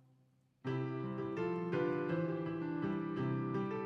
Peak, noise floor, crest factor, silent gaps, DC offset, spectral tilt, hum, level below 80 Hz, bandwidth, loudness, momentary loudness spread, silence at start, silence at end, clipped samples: -24 dBFS; -72 dBFS; 14 dB; none; under 0.1%; -9.5 dB/octave; none; -74 dBFS; 6.4 kHz; -38 LUFS; 5 LU; 0.65 s; 0 s; under 0.1%